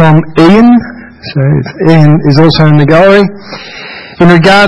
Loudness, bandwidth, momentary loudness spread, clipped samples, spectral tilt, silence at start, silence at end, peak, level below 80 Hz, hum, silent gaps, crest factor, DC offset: -5 LUFS; 9.8 kHz; 19 LU; 7%; -7.5 dB/octave; 0 s; 0 s; 0 dBFS; -34 dBFS; none; none; 6 dB; under 0.1%